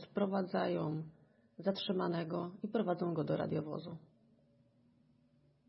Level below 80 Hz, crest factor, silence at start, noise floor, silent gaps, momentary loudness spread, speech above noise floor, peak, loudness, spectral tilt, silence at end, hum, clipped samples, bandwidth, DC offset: -80 dBFS; 18 dB; 0 s; -71 dBFS; none; 9 LU; 34 dB; -22 dBFS; -38 LUFS; -6 dB/octave; 1.7 s; none; under 0.1%; 5.6 kHz; under 0.1%